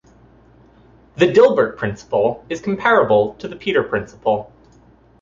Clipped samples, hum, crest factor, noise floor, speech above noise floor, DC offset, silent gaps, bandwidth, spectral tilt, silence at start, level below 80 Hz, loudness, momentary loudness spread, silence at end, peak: under 0.1%; none; 16 dB; -50 dBFS; 33 dB; under 0.1%; none; 7.6 kHz; -6 dB/octave; 1.15 s; -52 dBFS; -17 LUFS; 12 LU; 0.75 s; -2 dBFS